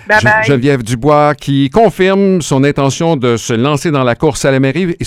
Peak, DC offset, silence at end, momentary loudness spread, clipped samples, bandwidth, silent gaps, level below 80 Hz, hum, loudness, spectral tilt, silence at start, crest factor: 0 dBFS; under 0.1%; 0 s; 4 LU; 0.3%; 15 kHz; none; -38 dBFS; none; -11 LUFS; -5.5 dB/octave; 0.05 s; 10 dB